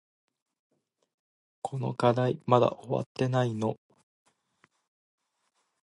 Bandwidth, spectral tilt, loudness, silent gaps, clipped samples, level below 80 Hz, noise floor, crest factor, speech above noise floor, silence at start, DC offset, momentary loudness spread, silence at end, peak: 11 kHz; -7.5 dB/octave; -28 LUFS; 3.06-3.15 s; under 0.1%; -70 dBFS; -77 dBFS; 24 dB; 50 dB; 1.65 s; under 0.1%; 12 LU; 2.2 s; -8 dBFS